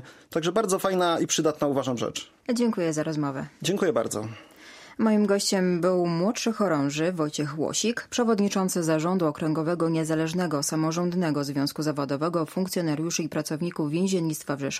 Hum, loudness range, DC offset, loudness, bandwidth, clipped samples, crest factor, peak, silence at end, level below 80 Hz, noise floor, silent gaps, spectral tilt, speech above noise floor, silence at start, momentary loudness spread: none; 2 LU; under 0.1%; -26 LUFS; 15.5 kHz; under 0.1%; 16 dB; -10 dBFS; 0 s; -66 dBFS; -48 dBFS; none; -5 dB/octave; 23 dB; 0 s; 7 LU